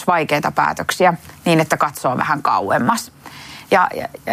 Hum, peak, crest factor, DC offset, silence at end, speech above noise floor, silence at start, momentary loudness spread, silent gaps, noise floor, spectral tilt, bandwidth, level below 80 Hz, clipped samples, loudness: none; -2 dBFS; 16 dB; under 0.1%; 0 s; 19 dB; 0 s; 12 LU; none; -37 dBFS; -4.5 dB/octave; 15.5 kHz; -56 dBFS; under 0.1%; -17 LUFS